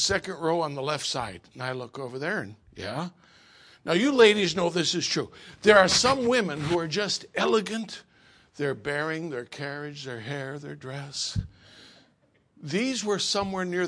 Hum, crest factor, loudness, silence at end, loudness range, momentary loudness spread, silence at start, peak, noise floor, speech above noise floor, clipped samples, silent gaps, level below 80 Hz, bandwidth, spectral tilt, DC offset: none; 24 dB; -26 LUFS; 0 s; 12 LU; 19 LU; 0 s; -4 dBFS; -66 dBFS; 39 dB; under 0.1%; none; -56 dBFS; 10.5 kHz; -3.5 dB/octave; under 0.1%